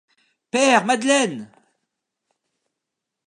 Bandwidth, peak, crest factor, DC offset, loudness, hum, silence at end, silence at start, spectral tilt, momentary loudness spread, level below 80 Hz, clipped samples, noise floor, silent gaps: 11 kHz; -2 dBFS; 22 dB; under 0.1%; -18 LUFS; none; 1.8 s; 0.55 s; -2.5 dB/octave; 10 LU; -80 dBFS; under 0.1%; -83 dBFS; none